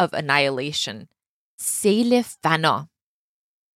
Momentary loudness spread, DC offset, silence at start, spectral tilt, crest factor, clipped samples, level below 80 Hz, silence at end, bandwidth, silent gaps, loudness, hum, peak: 9 LU; under 0.1%; 0 s; -3.5 dB/octave; 20 dB; under 0.1%; -68 dBFS; 0.9 s; 16 kHz; 1.29-1.58 s; -21 LUFS; none; -4 dBFS